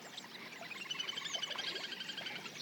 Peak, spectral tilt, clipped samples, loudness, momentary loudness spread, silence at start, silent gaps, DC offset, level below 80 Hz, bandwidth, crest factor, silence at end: -26 dBFS; -0.5 dB/octave; under 0.1%; -41 LUFS; 9 LU; 0 s; none; under 0.1%; under -90 dBFS; 19 kHz; 18 dB; 0 s